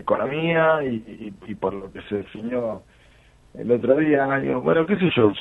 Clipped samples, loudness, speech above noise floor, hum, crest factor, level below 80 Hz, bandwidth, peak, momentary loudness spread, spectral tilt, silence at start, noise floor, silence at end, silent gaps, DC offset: under 0.1%; -22 LUFS; 31 dB; none; 20 dB; -54 dBFS; 4.1 kHz; -4 dBFS; 16 LU; -8.5 dB/octave; 0 s; -53 dBFS; 0 s; none; under 0.1%